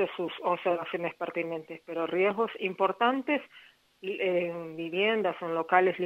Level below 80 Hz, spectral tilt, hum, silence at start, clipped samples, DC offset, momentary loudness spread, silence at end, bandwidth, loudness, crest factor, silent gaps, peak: -80 dBFS; -6.5 dB/octave; none; 0 s; under 0.1%; under 0.1%; 10 LU; 0 s; 7.6 kHz; -30 LUFS; 22 dB; none; -8 dBFS